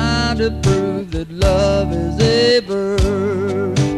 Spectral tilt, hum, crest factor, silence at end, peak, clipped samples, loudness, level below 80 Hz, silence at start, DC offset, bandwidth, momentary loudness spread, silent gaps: -6 dB/octave; none; 14 dB; 0 s; -2 dBFS; under 0.1%; -17 LUFS; -26 dBFS; 0 s; under 0.1%; 13 kHz; 6 LU; none